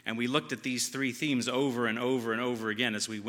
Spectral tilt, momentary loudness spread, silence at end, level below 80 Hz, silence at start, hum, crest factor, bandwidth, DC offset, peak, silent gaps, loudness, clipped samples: -3.5 dB/octave; 2 LU; 0 s; -80 dBFS; 0.05 s; none; 20 dB; 17.5 kHz; under 0.1%; -12 dBFS; none; -30 LUFS; under 0.1%